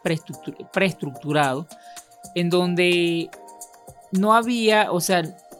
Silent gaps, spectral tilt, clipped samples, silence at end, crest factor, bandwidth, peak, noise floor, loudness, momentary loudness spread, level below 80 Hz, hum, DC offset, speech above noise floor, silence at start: none; -5 dB/octave; under 0.1%; 0.05 s; 18 dB; 16.5 kHz; -4 dBFS; -45 dBFS; -21 LUFS; 23 LU; -68 dBFS; none; under 0.1%; 23 dB; 0.05 s